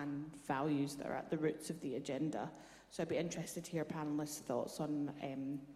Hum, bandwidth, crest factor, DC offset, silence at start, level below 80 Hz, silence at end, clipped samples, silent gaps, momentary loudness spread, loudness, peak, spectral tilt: none; 15 kHz; 18 dB; under 0.1%; 0 s; -74 dBFS; 0 s; under 0.1%; none; 6 LU; -41 LUFS; -24 dBFS; -5.5 dB/octave